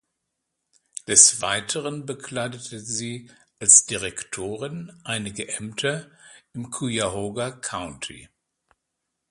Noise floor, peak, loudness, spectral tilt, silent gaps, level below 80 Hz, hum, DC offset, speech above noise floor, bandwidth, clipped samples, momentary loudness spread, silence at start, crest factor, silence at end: -80 dBFS; 0 dBFS; -21 LUFS; -1.5 dB/octave; none; -58 dBFS; none; under 0.1%; 56 dB; 14.5 kHz; under 0.1%; 22 LU; 1.1 s; 26 dB; 1.05 s